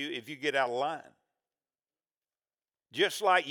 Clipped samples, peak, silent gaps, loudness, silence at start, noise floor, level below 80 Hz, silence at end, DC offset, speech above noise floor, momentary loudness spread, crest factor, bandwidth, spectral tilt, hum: under 0.1%; -12 dBFS; none; -30 LUFS; 0 s; under -90 dBFS; under -90 dBFS; 0 s; under 0.1%; over 60 dB; 13 LU; 22 dB; over 20 kHz; -2.5 dB/octave; none